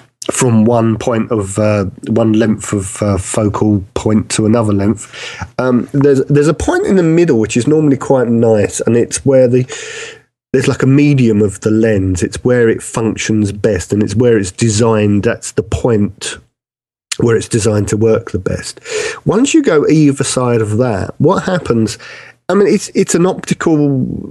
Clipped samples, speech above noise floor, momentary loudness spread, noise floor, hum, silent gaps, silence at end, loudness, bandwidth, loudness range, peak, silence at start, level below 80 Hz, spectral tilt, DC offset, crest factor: under 0.1%; over 78 dB; 9 LU; under -90 dBFS; none; none; 0 s; -13 LUFS; 12.5 kHz; 3 LU; 0 dBFS; 0.2 s; -40 dBFS; -6 dB/octave; under 0.1%; 12 dB